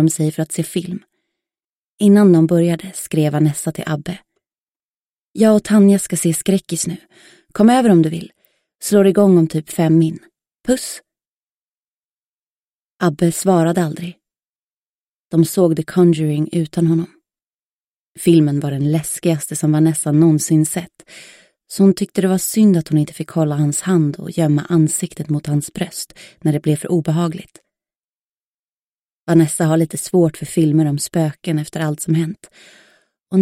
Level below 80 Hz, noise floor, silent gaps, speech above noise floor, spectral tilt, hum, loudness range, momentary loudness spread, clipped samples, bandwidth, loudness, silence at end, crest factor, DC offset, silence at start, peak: -56 dBFS; under -90 dBFS; 1.64-1.98 s, 4.60-4.75 s, 4.84-5.34 s, 11.27-11.47 s, 11.54-12.99 s, 14.47-15.29 s, 17.43-18.15 s, 27.97-29.27 s; over 75 dB; -6.5 dB/octave; none; 5 LU; 13 LU; under 0.1%; 16 kHz; -16 LUFS; 0 s; 16 dB; under 0.1%; 0 s; -2 dBFS